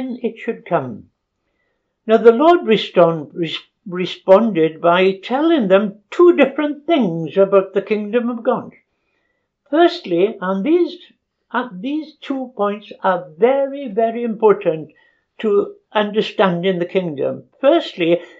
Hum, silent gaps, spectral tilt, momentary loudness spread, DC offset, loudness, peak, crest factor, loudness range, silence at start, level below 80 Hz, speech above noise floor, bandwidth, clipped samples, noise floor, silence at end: none; none; -7.5 dB/octave; 12 LU; under 0.1%; -17 LUFS; 0 dBFS; 16 dB; 5 LU; 0 s; -70 dBFS; 54 dB; 7.6 kHz; under 0.1%; -70 dBFS; 0.15 s